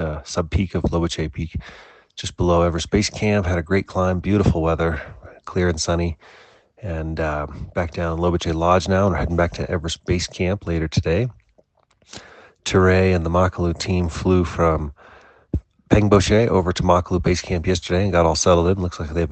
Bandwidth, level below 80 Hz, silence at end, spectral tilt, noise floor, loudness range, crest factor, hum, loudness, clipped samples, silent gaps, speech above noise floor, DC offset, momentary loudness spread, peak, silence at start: 8.8 kHz; -36 dBFS; 0 s; -6 dB/octave; -60 dBFS; 5 LU; 18 dB; none; -20 LUFS; under 0.1%; none; 40 dB; under 0.1%; 13 LU; -2 dBFS; 0 s